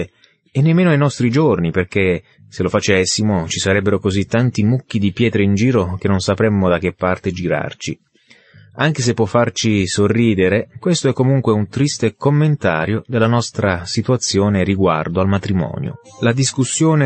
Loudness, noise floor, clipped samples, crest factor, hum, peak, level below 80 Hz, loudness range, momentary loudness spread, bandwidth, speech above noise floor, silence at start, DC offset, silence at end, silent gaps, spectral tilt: -16 LUFS; -49 dBFS; under 0.1%; 14 dB; none; -2 dBFS; -48 dBFS; 3 LU; 6 LU; 8.8 kHz; 33 dB; 0 s; under 0.1%; 0 s; none; -5.5 dB/octave